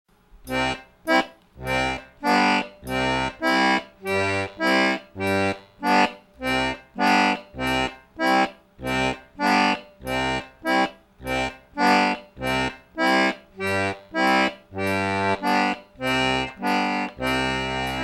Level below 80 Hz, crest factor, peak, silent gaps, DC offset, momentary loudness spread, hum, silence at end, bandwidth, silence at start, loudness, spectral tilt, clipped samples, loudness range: -48 dBFS; 20 dB; -4 dBFS; none; under 0.1%; 9 LU; none; 0 s; 16.5 kHz; 0.35 s; -23 LUFS; -4.5 dB/octave; under 0.1%; 1 LU